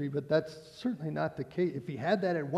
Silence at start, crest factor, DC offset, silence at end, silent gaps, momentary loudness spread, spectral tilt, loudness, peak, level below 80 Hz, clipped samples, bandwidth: 0 s; 16 dB; under 0.1%; 0 s; none; 7 LU; -7.5 dB/octave; -33 LUFS; -16 dBFS; -70 dBFS; under 0.1%; 13 kHz